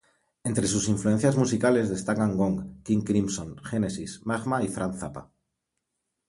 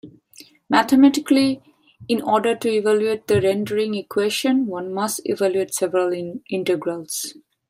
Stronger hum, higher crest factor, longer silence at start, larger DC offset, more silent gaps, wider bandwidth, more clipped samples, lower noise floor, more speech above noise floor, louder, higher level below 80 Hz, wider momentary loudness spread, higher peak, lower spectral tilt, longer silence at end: neither; about the same, 18 dB vs 18 dB; first, 0.45 s vs 0.05 s; neither; neither; second, 11.5 kHz vs 16 kHz; neither; first, -82 dBFS vs -49 dBFS; first, 56 dB vs 29 dB; second, -27 LUFS vs -20 LUFS; first, -52 dBFS vs -64 dBFS; about the same, 11 LU vs 11 LU; second, -8 dBFS vs -2 dBFS; about the same, -5.5 dB/octave vs -4.5 dB/octave; first, 1.05 s vs 0.4 s